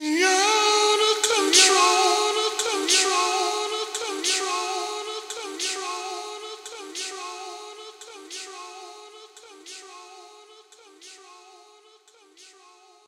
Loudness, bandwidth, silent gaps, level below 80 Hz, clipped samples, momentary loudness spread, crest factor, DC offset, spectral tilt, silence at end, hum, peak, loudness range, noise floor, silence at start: -21 LUFS; 16 kHz; none; -76 dBFS; under 0.1%; 23 LU; 22 dB; under 0.1%; 2 dB/octave; 0.65 s; none; -2 dBFS; 23 LU; -56 dBFS; 0 s